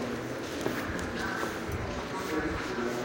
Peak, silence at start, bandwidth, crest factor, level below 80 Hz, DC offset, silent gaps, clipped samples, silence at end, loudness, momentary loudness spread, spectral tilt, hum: -16 dBFS; 0 s; 17 kHz; 18 dB; -48 dBFS; under 0.1%; none; under 0.1%; 0 s; -34 LUFS; 3 LU; -5 dB/octave; none